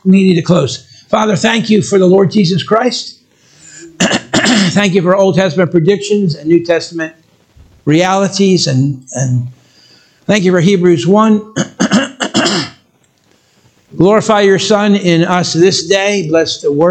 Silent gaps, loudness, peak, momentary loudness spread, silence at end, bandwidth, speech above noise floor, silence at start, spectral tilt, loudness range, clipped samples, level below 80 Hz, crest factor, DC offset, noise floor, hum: none; -11 LUFS; 0 dBFS; 8 LU; 0 s; 9.2 kHz; 43 dB; 0.05 s; -5 dB/octave; 3 LU; 0.1%; -52 dBFS; 12 dB; under 0.1%; -53 dBFS; none